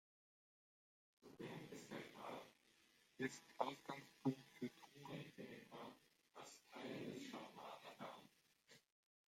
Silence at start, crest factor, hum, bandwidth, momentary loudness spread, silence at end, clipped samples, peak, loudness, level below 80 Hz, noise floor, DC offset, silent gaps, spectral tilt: 1.2 s; 30 dB; none; 16 kHz; 14 LU; 0.55 s; under 0.1%; -24 dBFS; -53 LUFS; under -90 dBFS; -76 dBFS; under 0.1%; none; -5 dB/octave